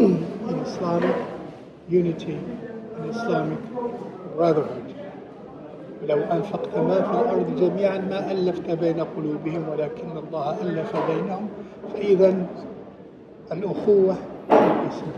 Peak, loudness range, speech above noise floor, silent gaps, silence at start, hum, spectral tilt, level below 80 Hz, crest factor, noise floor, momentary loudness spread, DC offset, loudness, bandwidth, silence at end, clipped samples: -2 dBFS; 4 LU; 21 dB; none; 0 s; none; -8.5 dB/octave; -60 dBFS; 22 dB; -44 dBFS; 19 LU; under 0.1%; -24 LUFS; 7 kHz; 0 s; under 0.1%